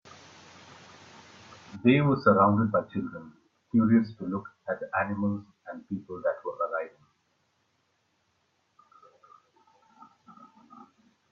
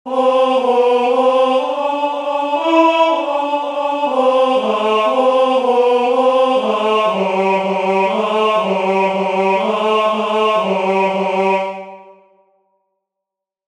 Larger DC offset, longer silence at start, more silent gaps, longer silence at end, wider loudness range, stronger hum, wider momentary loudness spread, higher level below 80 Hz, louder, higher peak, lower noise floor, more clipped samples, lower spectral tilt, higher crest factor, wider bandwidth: neither; first, 1.7 s vs 0.05 s; neither; first, 4.45 s vs 1.55 s; first, 12 LU vs 3 LU; neither; first, 19 LU vs 5 LU; about the same, -68 dBFS vs -66 dBFS; second, -27 LUFS vs -15 LUFS; second, -8 dBFS vs 0 dBFS; second, -73 dBFS vs -82 dBFS; neither; first, -8.5 dB/octave vs -5.5 dB/octave; first, 22 dB vs 14 dB; second, 7 kHz vs 10.5 kHz